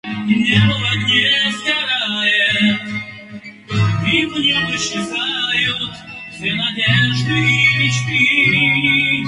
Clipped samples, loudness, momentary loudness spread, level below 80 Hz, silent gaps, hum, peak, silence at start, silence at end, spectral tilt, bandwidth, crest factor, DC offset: under 0.1%; -15 LUFS; 12 LU; -46 dBFS; none; none; 0 dBFS; 0.05 s; 0 s; -4 dB/octave; 11.5 kHz; 16 dB; under 0.1%